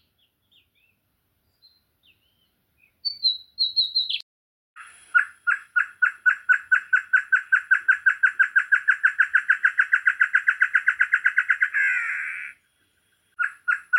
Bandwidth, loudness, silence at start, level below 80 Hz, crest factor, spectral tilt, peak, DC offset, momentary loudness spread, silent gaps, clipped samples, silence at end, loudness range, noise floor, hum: 11 kHz; -21 LUFS; 3.05 s; -80 dBFS; 18 dB; 3.5 dB/octave; -6 dBFS; under 0.1%; 8 LU; 4.23-4.76 s; under 0.1%; 0 s; 7 LU; -71 dBFS; none